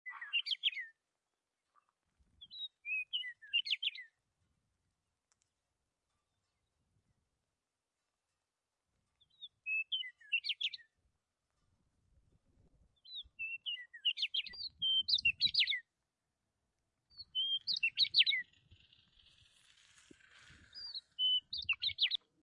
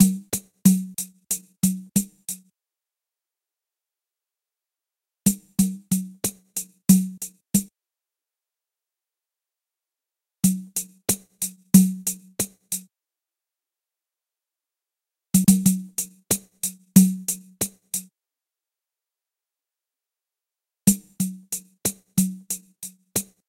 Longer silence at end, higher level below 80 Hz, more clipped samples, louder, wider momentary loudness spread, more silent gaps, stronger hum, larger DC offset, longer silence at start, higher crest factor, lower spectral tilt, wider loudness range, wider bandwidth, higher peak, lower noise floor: about the same, 0.25 s vs 0.25 s; second, -78 dBFS vs -58 dBFS; neither; second, -34 LUFS vs -23 LUFS; first, 19 LU vs 14 LU; neither; neither; neither; about the same, 0.05 s vs 0 s; about the same, 26 dB vs 26 dB; second, 1 dB/octave vs -5 dB/octave; about the same, 10 LU vs 11 LU; second, 11 kHz vs 16.5 kHz; second, -16 dBFS vs 0 dBFS; about the same, under -90 dBFS vs -89 dBFS